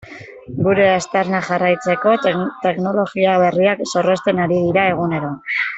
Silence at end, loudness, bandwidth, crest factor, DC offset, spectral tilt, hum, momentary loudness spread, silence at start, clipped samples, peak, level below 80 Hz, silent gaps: 0 s; -17 LUFS; 8.2 kHz; 14 dB; under 0.1%; -6 dB/octave; none; 7 LU; 0.05 s; under 0.1%; -2 dBFS; -54 dBFS; none